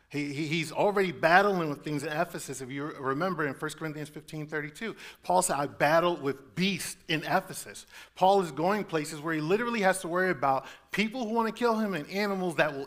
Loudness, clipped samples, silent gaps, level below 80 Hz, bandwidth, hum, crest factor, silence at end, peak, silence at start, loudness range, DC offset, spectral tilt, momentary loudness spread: -29 LUFS; under 0.1%; none; -64 dBFS; 16 kHz; none; 24 dB; 0 s; -6 dBFS; 0.1 s; 4 LU; under 0.1%; -4.5 dB/octave; 13 LU